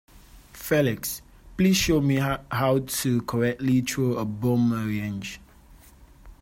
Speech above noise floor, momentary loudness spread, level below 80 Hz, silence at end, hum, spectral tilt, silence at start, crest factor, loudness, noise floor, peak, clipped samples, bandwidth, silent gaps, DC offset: 27 dB; 13 LU; -48 dBFS; 0.1 s; none; -5.5 dB/octave; 0.15 s; 16 dB; -24 LUFS; -51 dBFS; -10 dBFS; under 0.1%; 16.5 kHz; none; under 0.1%